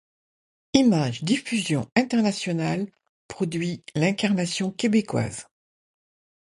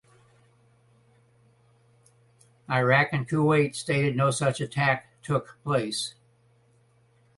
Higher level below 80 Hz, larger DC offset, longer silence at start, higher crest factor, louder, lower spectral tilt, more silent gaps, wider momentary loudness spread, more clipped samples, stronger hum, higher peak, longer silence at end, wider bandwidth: about the same, -60 dBFS vs -62 dBFS; neither; second, 0.75 s vs 2.7 s; about the same, 22 dB vs 22 dB; about the same, -24 LUFS vs -25 LUFS; about the same, -5.5 dB/octave vs -5.5 dB/octave; first, 1.92-1.96 s, 3.09-3.29 s vs none; about the same, 10 LU vs 8 LU; neither; neither; about the same, -4 dBFS vs -6 dBFS; second, 1.1 s vs 1.3 s; about the same, 11.5 kHz vs 11.5 kHz